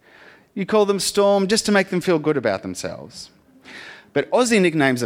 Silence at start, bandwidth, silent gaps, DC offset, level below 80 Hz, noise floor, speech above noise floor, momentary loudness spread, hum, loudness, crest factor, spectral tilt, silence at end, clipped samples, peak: 0.55 s; 16.5 kHz; none; under 0.1%; -58 dBFS; -49 dBFS; 30 dB; 20 LU; none; -19 LUFS; 16 dB; -4.5 dB/octave; 0 s; under 0.1%; -4 dBFS